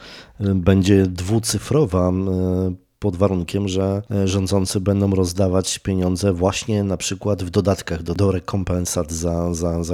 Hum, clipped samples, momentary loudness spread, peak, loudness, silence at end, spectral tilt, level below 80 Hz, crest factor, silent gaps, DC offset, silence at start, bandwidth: none; under 0.1%; 6 LU; -2 dBFS; -20 LUFS; 0 s; -6 dB/octave; -40 dBFS; 18 dB; none; under 0.1%; 0 s; 15.5 kHz